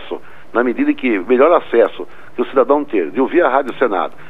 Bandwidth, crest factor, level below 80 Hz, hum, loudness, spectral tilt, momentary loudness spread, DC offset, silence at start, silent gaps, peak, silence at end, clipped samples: 4.5 kHz; 16 dB; -58 dBFS; none; -15 LUFS; -7 dB/octave; 13 LU; 3%; 0 s; none; 0 dBFS; 0.2 s; under 0.1%